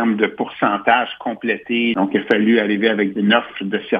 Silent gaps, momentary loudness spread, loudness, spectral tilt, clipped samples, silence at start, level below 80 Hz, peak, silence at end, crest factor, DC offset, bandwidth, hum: none; 8 LU; -18 LUFS; -7.5 dB/octave; under 0.1%; 0 s; -64 dBFS; 0 dBFS; 0 s; 18 dB; under 0.1%; 5 kHz; none